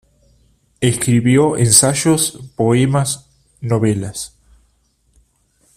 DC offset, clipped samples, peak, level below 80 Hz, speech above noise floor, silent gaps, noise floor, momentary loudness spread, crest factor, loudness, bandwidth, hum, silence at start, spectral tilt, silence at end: under 0.1%; under 0.1%; 0 dBFS; -48 dBFS; 46 dB; none; -60 dBFS; 16 LU; 18 dB; -15 LUFS; 16 kHz; none; 0.8 s; -4.5 dB/octave; 1.5 s